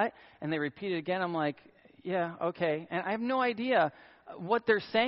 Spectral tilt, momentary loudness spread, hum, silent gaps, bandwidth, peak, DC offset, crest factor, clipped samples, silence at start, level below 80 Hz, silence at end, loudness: -3.5 dB/octave; 11 LU; none; none; 5.6 kHz; -14 dBFS; under 0.1%; 18 dB; under 0.1%; 0 s; -74 dBFS; 0 s; -32 LUFS